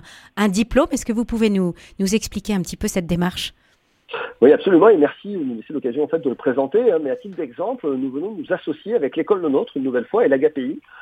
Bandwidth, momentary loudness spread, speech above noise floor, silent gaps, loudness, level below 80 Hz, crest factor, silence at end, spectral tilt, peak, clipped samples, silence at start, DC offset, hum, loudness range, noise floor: 15.5 kHz; 13 LU; 29 dB; none; -20 LUFS; -44 dBFS; 20 dB; 0 s; -5.5 dB/octave; 0 dBFS; under 0.1%; 0.05 s; under 0.1%; none; 5 LU; -49 dBFS